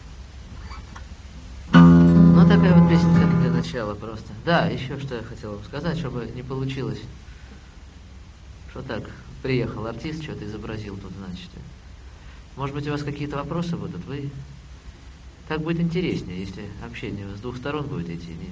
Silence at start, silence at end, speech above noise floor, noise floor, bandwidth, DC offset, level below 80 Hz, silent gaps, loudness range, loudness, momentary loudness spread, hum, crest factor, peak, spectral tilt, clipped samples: 0.05 s; 0 s; 15 dB; -43 dBFS; 7.4 kHz; under 0.1%; -40 dBFS; none; 16 LU; -21 LUFS; 26 LU; none; 22 dB; -2 dBFS; -8 dB/octave; under 0.1%